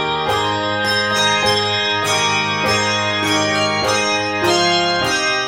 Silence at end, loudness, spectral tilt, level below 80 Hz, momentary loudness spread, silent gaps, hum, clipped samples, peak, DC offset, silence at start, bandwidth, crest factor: 0 s; -16 LUFS; -2.5 dB/octave; -48 dBFS; 4 LU; none; none; under 0.1%; -2 dBFS; under 0.1%; 0 s; 17 kHz; 14 dB